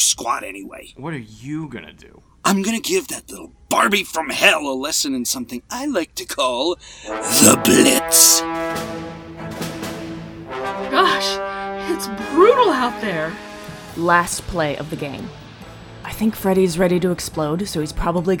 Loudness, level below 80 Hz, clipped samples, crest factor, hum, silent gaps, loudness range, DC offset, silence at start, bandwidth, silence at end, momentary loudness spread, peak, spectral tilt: -18 LUFS; -42 dBFS; under 0.1%; 20 dB; none; none; 8 LU; under 0.1%; 0 s; over 20 kHz; 0 s; 21 LU; 0 dBFS; -2.5 dB/octave